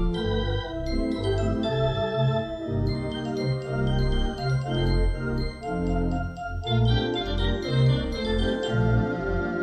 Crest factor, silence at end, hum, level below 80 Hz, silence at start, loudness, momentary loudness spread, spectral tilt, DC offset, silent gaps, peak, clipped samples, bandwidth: 14 dB; 0 s; none; -32 dBFS; 0 s; -26 LUFS; 6 LU; -7.5 dB/octave; under 0.1%; none; -12 dBFS; under 0.1%; 9 kHz